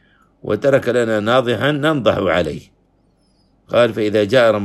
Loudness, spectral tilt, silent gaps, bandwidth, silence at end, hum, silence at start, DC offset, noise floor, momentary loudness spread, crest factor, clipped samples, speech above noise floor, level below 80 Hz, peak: -16 LUFS; -6 dB/octave; none; 13 kHz; 0 s; none; 0.45 s; under 0.1%; -58 dBFS; 8 LU; 16 dB; under 0.1%; 42 dB; -50 dBFS; 0 dBFS